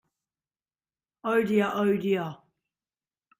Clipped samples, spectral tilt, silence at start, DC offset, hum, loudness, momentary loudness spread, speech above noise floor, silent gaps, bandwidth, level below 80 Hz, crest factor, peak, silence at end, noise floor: under 0.1%; -7 dB/octave; 1.25 s; under 0.1%; none; -26 LUFS; 10 LU; over 65 dB; none; 16 kHz; -70 dBFS; 18 dB; -12 dBFS; 1.05 s; under -90 dBFS